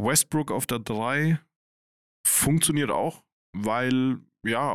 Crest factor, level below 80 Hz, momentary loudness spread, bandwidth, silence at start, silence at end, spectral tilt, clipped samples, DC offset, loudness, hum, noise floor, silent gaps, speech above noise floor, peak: 18 dB; -56 dBFS; 9 LU; 17.5 kHz; 0 s; 0 s; -4 dB/octave; under 0.1%; 0.2%; -25 LUFS; none; under -90 dBFS; 1.56-2.24 s, 3.32-3.53 s; over 65 dB; -8 dBFS